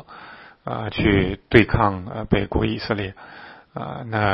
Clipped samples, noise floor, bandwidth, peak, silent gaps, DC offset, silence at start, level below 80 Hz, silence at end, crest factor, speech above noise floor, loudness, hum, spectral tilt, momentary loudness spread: under 0.1%; -43 dBFS; 5.8 kHz; 0 dBFS; none; under 0.1%; 0.1 s; -36 dBFS; 0 s; 22 dB; 22 dB; -22 LUFS; none; -8.5 dB/octave; 23 LU